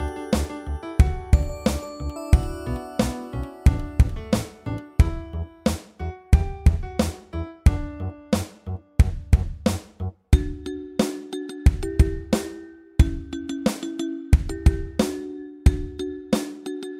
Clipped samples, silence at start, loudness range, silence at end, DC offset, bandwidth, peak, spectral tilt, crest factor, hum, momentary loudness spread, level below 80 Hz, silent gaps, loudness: under 0.1%; 0 s; 1 LU; 0 s; under 0.1%; 15.5 kHz; -2 dBFS; -6.5 dB/octave; 20 dB; none; 11 LU; -26 dBFS; none; -25 LUFS